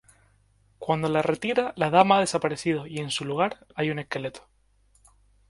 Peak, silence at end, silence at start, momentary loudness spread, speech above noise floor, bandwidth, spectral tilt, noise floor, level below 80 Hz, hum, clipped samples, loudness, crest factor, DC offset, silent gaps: -2 dBFS; 1.1 s; 0.8 s; 11 LU; 38 dB; 11.5 kHz; -5 dB/octave; -63 dBFS; -60 dBFS; 50 Hz at -55 dBFS; under 0.1%; -25 LUFS; 24 dB; under 0.1%; none